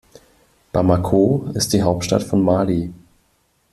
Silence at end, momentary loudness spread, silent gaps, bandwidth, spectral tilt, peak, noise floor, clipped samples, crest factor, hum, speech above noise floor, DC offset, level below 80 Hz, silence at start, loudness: 0.8 s; 7 LU; none; 14.5 kHz; -6 dB/octave; -2 dBFS; -63 dBFS; under 0.1%; 16 dB; none; 46 dB; under 0.1%; -46 dBFS; 0.75 s; -18 LUFS